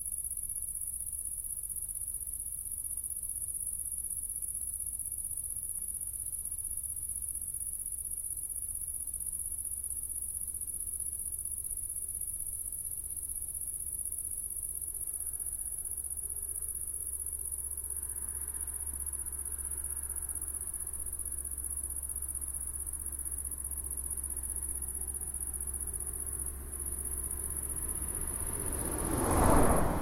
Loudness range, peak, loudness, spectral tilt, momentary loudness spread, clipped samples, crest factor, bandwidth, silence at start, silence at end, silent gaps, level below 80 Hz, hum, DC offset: 1 LU; -12 dBFS; -35 LUFS; -4 dB/octave; 2 LU; under 0.1%; 24 dB; 16.5 kHz; 0 s; 0 s; none; -44 dBFS; none; under 0.1%